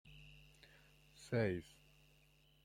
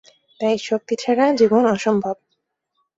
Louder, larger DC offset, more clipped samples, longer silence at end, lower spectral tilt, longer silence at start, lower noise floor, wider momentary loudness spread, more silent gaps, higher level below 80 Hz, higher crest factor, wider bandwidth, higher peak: second, -41 LUFS vs -19 LUFS; neither; neither; first, 1 s vs 0.85 s; first, -7 dB/octave vs -5.5 dB/octave; second, 0.05 s vs 0.4 s; about the same, -71 dBFS vs -73 dBFS; first, 25 LU vs 9 LU; neither; second, -70 dBFS vs -62 dBFS; first, 22 dB vs 16 dB; first, 16 kHz vs 8 kHz; second, -24 dBFS vs -4 dBFS